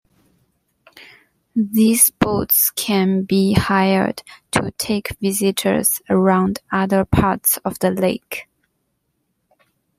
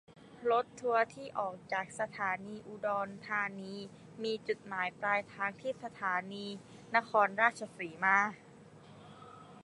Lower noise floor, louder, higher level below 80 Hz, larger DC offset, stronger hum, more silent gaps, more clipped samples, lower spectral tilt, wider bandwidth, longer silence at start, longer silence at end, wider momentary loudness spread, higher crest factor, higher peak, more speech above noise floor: first, -71 dBFS vs -56 dBFS; first, -17 LUFS vs -34 LUFS; first, -44 dBFS vs -78 dBFS; neither; neither; neither; neither; about the same, -4.5 dB/octave vs -4.5 dB/octave; first, 16 kHz vs 11.5 kHz; first, 0.95 s vs 0.1 s; first, 1.55 s vs 0 s; second, 8 LU vs 18 LU; about the same, 20 dB vs 24 dB; first, 0 dBFS vs -12 dBFS; first, 53 dB vs 21 dB